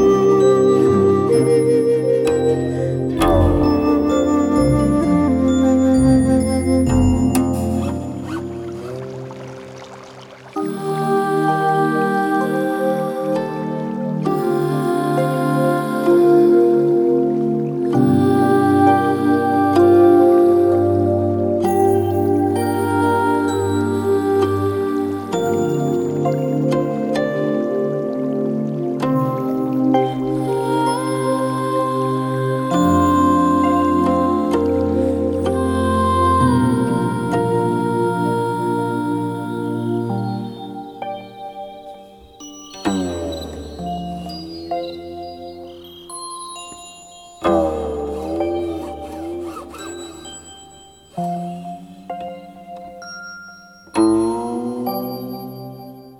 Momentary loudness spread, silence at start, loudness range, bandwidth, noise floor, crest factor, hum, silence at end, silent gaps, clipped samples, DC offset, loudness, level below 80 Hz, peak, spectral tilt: 19 LU; 0 s; 13 LU; 18.5 kHz; -44 dBFS; 16 dB; none; 0.1 s; none; under 0.1%; under 0.1%; -17 LUFS; -38 dBFS; -2 dBFS; -7 dB/octave